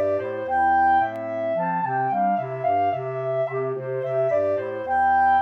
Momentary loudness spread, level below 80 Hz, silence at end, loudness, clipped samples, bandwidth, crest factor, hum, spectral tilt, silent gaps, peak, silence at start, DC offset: 8 LU; -58 dBFS; 0 s; -23 LUFS; under 0.1%; 5.8 kHz; 12 dB; 50 Hz at -65 dBFS; -8.5 dB/octave; none; -12 dBFS; 0 s; under 0.1%